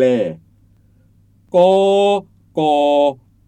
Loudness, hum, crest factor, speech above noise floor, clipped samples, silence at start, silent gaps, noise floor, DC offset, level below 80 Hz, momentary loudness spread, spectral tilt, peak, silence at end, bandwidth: -15 LUFS; none; 14 dB; 39 dB; under 0.1%; 0 s; none; -52 dBFS; under 0.1%; -58 dBFS; 9 LU; -6 dB/octave; -2 dBFS; 0.35 s; 9.2 kHz